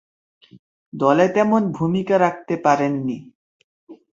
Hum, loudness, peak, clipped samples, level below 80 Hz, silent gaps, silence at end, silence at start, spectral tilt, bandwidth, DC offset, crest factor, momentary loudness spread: none; -19 LUFS; -2 dBFS; under 0.1%; -62 dBFS; 3.35-3.87 s; 0.2 s; 0.95 s; -7 dB/octave; 7.6 kHz; under 0.1%; 18 dB; 11 LU